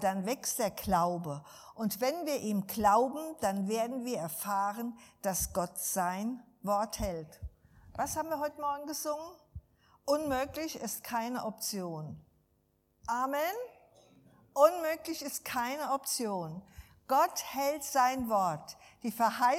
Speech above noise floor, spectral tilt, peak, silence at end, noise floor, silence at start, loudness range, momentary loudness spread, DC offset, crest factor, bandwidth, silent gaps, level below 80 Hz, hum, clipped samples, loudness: 41 dB; -4 dB/octave; -10 dBFS; 0 s; -73 dBFS; 0 s; 5 LU; 15 LU; under 0.1%; 24 dB; 17 kHz; none; -58 dBFS; none; under 0.1%; -33 LUFS